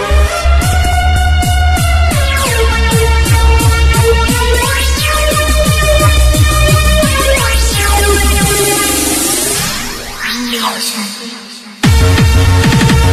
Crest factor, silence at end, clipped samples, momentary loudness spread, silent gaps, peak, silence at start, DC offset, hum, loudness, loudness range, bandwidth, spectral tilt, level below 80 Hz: 10 dB; 0 s; under 0.1%; 7 LU; none; 0 dBFS; 0 s; under 0.1%; none; -10 LUFS; 3 LU; 15.5 kHz; -4 dB/octave; -14 dBFS